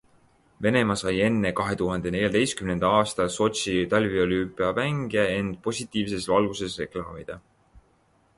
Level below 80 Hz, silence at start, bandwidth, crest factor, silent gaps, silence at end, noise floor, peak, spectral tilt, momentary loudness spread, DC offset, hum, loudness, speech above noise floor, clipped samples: -50 dBFS; 0.6 s; 11.5 kHz; 18 dB; none; 0.6 s; -64 dBFS; -8 dBFS; -5 dB/octave; 9 LU; under 0.1%; none; -25 LUFS; 39 dB; under 0.1%